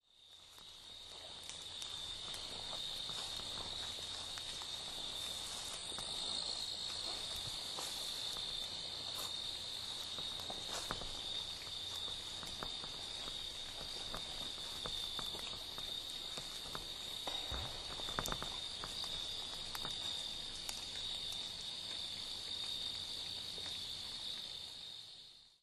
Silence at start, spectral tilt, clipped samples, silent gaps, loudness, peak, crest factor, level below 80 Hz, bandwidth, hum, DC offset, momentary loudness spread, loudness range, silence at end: 0.15 s; -1 dB/octave; under 0.1%; none; -42 LUFS; -18 dBFS; 26 dB; -60 dBFS; 13 kHz; none; under 0.1%; 4 LU; 2 LU; 0.05 s